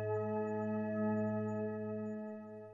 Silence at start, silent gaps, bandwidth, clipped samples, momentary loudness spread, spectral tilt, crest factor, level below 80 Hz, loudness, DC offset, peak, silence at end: 0 s; none; 7.2 kHz; under 0.1%; 9 LU; -10.5 dB/octave; 12 dB; -82 dBFS; -39 LUFS; under 0.1%; -26 dBFS; 0 s